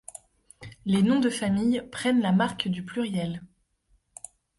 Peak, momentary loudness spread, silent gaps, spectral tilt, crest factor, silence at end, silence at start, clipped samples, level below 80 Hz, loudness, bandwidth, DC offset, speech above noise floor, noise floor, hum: -12 dBFS; 21 LU; none; -5.5 dB/octave; 16 dB; 1.15 s; 0.6 s; under 0.1%; -58 dBFS; -26 LUFS; 11.5 kHz; under 0.1%; 43 dB; -68 dBFS; none